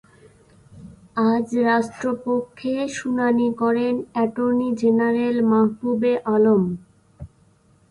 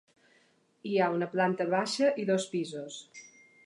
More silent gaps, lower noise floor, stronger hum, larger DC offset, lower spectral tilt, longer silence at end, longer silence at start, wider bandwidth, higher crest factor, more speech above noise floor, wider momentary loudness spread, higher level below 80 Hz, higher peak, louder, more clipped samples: neither; second, -57 dBFS vs -67 dBFS; neither; neither; first, -7 dB/octave vs -5 dB/octave; first, 0.65 s vs 0.4 s; about the same, 0.75 s vs 0.85 s; about the same, 10.5 kHz vs 11.5 kHz; about the same, 14 dB vs 18 dB; about the same, 37 dB vs 38 dB; second, 7 LU vs 17 LU; first, -56 dBFS vs -84 dBFS; first, -8 dBFS vs -14 dBFS; first, -21 LUFS vs -30 LUFS; neither